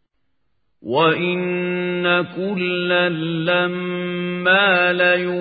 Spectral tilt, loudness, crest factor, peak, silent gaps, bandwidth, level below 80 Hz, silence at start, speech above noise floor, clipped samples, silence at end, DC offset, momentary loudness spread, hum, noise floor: -10.5 dB/octave; -18 LUFS; 18 dB; -2 dBFS; none; 4.9 kHz; -66 dBFS; 0.85 s; 54 dB; under 0.1%; 0 s; under 0.1%; 9 LU; none; -73 dBFS